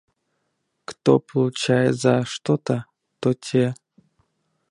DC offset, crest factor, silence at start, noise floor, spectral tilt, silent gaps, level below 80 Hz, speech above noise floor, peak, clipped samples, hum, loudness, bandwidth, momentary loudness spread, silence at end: under 0.1%; 22 dB; 0.9 s; -74 dBFS; -6 dB/octave; none; -64 dBFS; 54 dB; -2 dBFS; under 0.1%; none; -22 LUFS; 11.5 kHz; 9 LU; 0.95 s